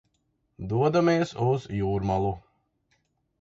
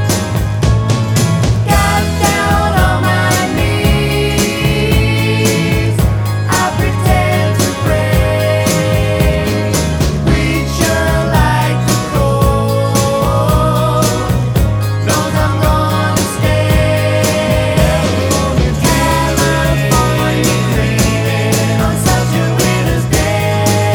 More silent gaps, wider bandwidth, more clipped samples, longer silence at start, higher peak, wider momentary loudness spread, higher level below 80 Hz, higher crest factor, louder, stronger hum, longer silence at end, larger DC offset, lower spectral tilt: neither; second, 7.8 kHz vs over 20 kHz; neither; first, 0.6 s vs 0 s; second, -10 dBFS vs 0 dBFS; first, 9 LU vs 2 LU; second, -50 dBFS vs -22 dBFS; about the same, 16 dB vs 12 dB; second, -26 LUFS vs -13 LUFS; neither; first, 1 s vs 0 s; neither; first, -7.5 dB/octave vs -5 dB/octave